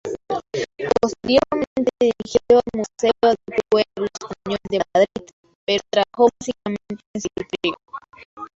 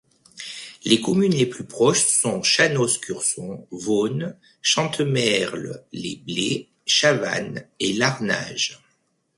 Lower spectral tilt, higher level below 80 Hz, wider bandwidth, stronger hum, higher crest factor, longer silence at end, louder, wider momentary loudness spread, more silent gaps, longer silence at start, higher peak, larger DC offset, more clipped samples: first, -4.5 dB/octave vs -3 dB/octave; first, -52 dBFS vs -62 dBFS; second, 7.8 kHz vs 11.5 kHz; neither; about the same, 18 dB vs 20 dB; second, 0.1 s vs 0.6 s; about the same, -21 LUFS vs -21 LUFS; about the same, 14 LU vs 15 LU; first, 1.67-1.76 s, 5.33-5.44 s, 5.55-5.67 s, 7.06-7.14 s, 8.25-8.37 s vs none; second, 0.05 s vs 0.35 s; about the same, -2 dBFS vs -2 dBFS; neither; neither